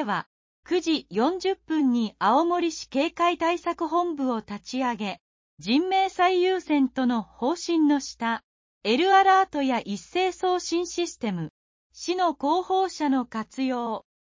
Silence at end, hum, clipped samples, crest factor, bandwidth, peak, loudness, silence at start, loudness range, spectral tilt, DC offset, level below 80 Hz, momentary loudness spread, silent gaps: 0.35 s; none; under 0.1%; 16 dB; 7.6 kHz; -8 dBFS; -25 LUFS; 0 s; 4 LU; -4 dB/octave; under 0.1%; -64 dBFS; 10 LU; 0.26-0.63 s, 5.21-5.57 s, 8.44-8.81 s, 11.50-11.90 s